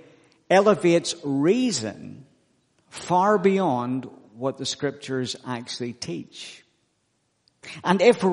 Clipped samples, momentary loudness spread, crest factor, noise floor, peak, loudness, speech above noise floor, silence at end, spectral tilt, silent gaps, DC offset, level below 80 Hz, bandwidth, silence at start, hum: under 0.1%; 21 LU; 20 dB; -71 dBFS; -4 dBFS; -23 LUFS; 48 dB; 0 s; -5 dB/octave; none; under 0.1%; -70 dBFS; 10.5 kHz; 0.5 s; none